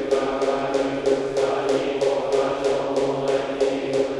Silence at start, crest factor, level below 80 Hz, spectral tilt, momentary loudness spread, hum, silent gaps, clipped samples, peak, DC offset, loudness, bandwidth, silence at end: 0 s; 14 dB; -52 dBFS; -5 dB/octave; 2 LU; none; none; under 0.1%; -8 dBFS; under 0.1%; -23 LUFS; 11 kHz; 0 s